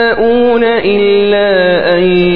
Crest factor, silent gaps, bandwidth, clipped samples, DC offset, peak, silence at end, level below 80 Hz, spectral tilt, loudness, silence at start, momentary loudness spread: 8 dB; none; 5.2 kHz; 0.1%; 3%; 0 dBFS; 0 s; -38 dBFS; -8.5 dB/octave; -9 LUFS; 0 s; 1 LU